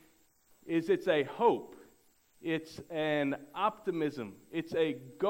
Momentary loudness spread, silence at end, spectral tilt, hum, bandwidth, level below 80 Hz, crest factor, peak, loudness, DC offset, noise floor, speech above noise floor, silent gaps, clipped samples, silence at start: 11 LU; 0 s; -6.5 dB/octave; none; 16 kHz; -72 dBFS; 20 dB; -14 dBFS; -33 LUFS; under 0.1%; -67 dBFS; 34 dB; none; under 0.1%; 0.65 s